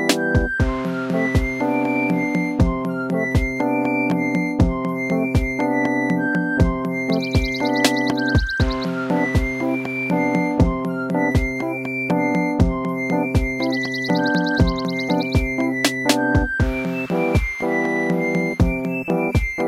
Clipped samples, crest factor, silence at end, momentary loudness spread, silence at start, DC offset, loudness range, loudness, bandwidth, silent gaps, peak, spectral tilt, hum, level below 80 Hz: under 0.1%; 18 dB; 0 s; 4 LU; 0 s; under 0.1%; 1 LU; -20 LUFS; 16 kHz; none; -2 dBFS; -6 dB/octave; none; -30 dBFS